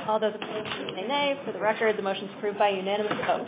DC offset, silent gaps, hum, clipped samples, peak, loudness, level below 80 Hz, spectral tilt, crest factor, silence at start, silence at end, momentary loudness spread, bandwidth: under 0.1%; none; none; under 0.1%; -10 dBFS; -28 LUFS; -70 dBFS; -8.5 dB/octave; 18 dB; 0 s; 0 s; 7 LU; 4 kHz